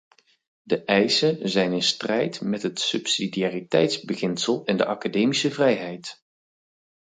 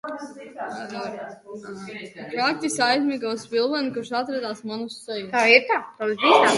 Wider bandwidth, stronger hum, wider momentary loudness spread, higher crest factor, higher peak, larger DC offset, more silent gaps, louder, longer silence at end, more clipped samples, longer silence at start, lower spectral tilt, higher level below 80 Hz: second, 9.6 kHz vs 11.5 kHz; neither; second, 7 LU vs 20 LU; about the same, 20 dB vs 22 dB; about the same, -4 dBFS vs -2 dBFS; neither; neither; about the same, -23 LUFS vs -22 LUFS; first, 0.9 s vs 0 s; neither; first, 0.65 s vs 0.05 s; about the same, -4 dB/octave vs -3 dB/octave; about the same, -68 dBFS vs -72 dBFS